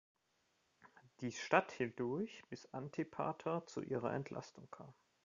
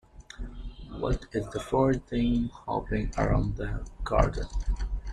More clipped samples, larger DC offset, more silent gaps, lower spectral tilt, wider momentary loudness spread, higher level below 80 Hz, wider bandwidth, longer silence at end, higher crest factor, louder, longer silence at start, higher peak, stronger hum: neither; neither; neither; second, -5 dB/octave vs -7.5 dB/octave; first, 20 LU vs 16 LU; second, -78 dBFS vs -34 dBFS; second, 7.6 kHz vs 10.5 kHz; first, 0.35 s vs 0 s; first, 28 dB vs 20 dB; second, -42 LUFS vs -30 LUFS; first, 0.85 s vs 0.15 s; second, -16 dBFS vs -8 dBFS; neither